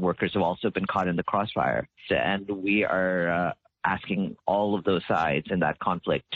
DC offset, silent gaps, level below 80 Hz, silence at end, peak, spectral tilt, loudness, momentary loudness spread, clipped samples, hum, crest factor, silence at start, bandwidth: under 0.1%; none; -56 dBFS; 0 s; -10 dBFS; -4 dB/octave; -26 LUFS; 4 LU; under 0.1%; none; 16 dB; 0 s; 7.2 kHz